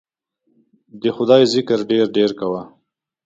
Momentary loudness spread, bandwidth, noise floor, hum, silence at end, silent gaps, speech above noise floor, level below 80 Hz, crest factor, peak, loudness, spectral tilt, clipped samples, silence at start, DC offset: 11 LU; 9 kHz; -68 dBFS; none; 0.6 s; none; 51 dB; -62 dBFS; 18 dB; 0 dBFS; -17 LUFS; -5.5 dB/octave; under 0.1%; 0.95 s; under 0.1%